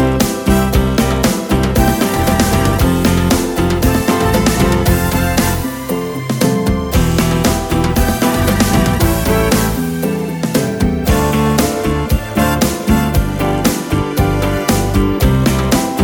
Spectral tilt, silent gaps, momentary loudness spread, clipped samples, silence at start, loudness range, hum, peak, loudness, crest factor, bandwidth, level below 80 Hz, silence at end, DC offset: -5.5 dB/octave; none; 4 LU; under 0.1%; 0 s; 2 LU; none; 0 dBFS; -14 LUFS; 14 dB; over 20 kHz; -22 dBFS; 0 s; under 0.1%